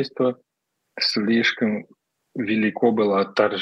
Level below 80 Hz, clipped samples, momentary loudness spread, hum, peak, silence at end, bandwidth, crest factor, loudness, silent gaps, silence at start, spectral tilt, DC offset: -78 dBFS; under 0.1%; 13 LU; none; -4 dBFS; 0 s; 9.6 kHz; 18 dB; -22 LUFS; none; 0 s; -5.5 dB/octave; under 0.1%